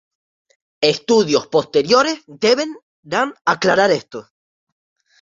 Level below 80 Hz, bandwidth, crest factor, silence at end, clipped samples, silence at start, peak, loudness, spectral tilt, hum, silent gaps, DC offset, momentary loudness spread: -62 dBFS; 7.8 kHz; 18 dB; 1 s; under 0.1%; 0.8 s; 0 dBFS; -17 LUFS; -3.5 dB/octave; none; 2.82-3.03 s; under 0.1%; 8 LU